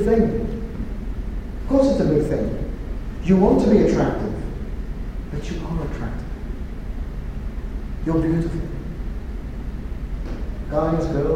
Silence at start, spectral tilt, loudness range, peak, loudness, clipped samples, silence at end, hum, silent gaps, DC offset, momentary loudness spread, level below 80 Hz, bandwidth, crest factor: 0 s; -8.5 dB/octave; 11 LU; -4 dBFS; -24 LUFS; under 0.1%; 0 s; none; none; under 0.1%; 15 LU; -28 dBFS; 9.8 kHz; 18 dB